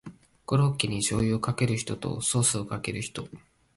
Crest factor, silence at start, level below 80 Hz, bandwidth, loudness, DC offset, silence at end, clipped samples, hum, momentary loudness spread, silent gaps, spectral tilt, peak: 20 dB; 0.05 s; -52 dBFS; 11.5 kHz; -27 LUFS; under 0.1%; 0.4 s; under 0.1%; none; 12 LU; none; -4.5 dB/octave; -8 dBFS